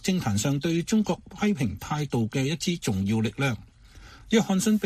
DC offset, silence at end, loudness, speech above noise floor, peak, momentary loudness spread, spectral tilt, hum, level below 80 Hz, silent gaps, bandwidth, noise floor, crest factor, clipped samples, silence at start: under 0.1%; 0 s; -26 LUFS; 23 dB; -8 dBFS; 5 LU; -5.5 dB/octave; none; -52 dBFS; none; 15.5 kHz; -49 dBFS; 18 dB; under 0.1%; 0 s